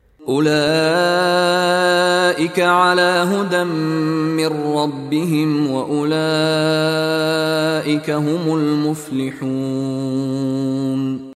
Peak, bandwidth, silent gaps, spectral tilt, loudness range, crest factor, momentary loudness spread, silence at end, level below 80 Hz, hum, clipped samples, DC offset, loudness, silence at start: -2 dBFS; 14.5 kHz; none; -5 dB/octave; 5 LU; 14 dB; 7 LU; 0.05 s; -60 dBFS; none; under 0.1%; under 0.1%; -17 LUFS; 0.2 s